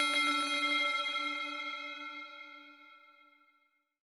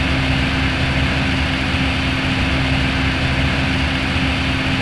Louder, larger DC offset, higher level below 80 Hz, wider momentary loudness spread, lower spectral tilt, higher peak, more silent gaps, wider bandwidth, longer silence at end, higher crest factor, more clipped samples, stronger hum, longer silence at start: second, -32 LUFS vs -17 LUFS; second, under 0.1% vs 0.7%; second, under -90 dBFS vs -26 dBFS; first, 20 LU vs 1 LU; second, 1.5 dB/octave vs -5.5 dB/octave; second, -18 dBFS vs -4 dBFS; neither; first, 16.5 kHz vs 11 kHz; first, 1.05 s vs 0 s; first, 20 dB vs 12 dB; neither; neither; about the same, 0 s vs 0 s